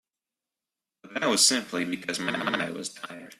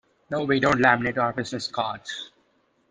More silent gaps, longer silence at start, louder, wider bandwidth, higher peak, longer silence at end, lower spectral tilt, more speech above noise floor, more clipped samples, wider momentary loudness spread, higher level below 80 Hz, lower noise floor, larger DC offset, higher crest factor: neither; first, 1.05 s vs 0.3 s; about the same, -25 LUFS vs -24 LUFS; first, 15 kHz vs 9.8 kHz; about the same, -6 dBFS vs -4 dBFS; second, 0.05 s vs 0.65 s; second, -1.5 dB/octave vs -5 dB/octave; first, 62 dB vs 42 dB; neither; about the same, 16 LU vs 16 LU; second, -72 dBFS vs -56 dBFS; first, -90 dBFS vs -66 dBFS; neither; about the same, 22 dB vs 22 dB